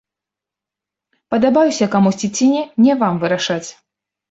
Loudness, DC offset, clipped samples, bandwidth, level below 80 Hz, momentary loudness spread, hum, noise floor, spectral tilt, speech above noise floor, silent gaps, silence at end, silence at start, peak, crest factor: -16 LUFS; under 0.1%; under 0.1%; 8 kHz; -60 dBFS; 8 LU; none; -86 dBFS; -5 dB/octave; 71 dB; none; 0.6 s; 1.3 s; -2 dBFS; 14 dB